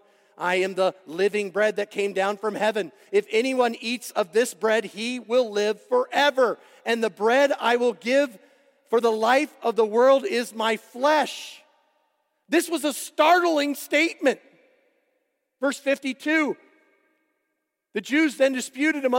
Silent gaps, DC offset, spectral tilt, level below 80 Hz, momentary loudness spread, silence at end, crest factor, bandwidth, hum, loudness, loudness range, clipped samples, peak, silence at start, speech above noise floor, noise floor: none; under 0.1%; -3 dB/octave; -90 dBFS; 8 LU; 0 s; 16 dB; 16.5 kHz; none; -23 LUFS; 4 LU; under 0.1%; -6 dBFS; 0.4 s; 56 dB; -79 dBFS